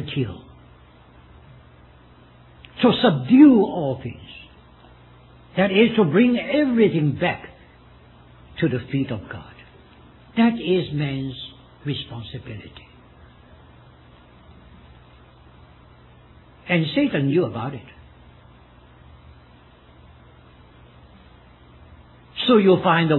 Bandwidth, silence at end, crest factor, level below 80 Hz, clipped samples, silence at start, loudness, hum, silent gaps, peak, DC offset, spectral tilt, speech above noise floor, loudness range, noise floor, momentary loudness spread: 4.2 kHz; 0 s; 22 dB; -52 dBFS; under 0.1%; 0 s; -20 LUFS; none; none; -2 dBFS; under 0.1%; -10 dB/octave; 31 dB; 13 LU; -50 dBFS; 22 LU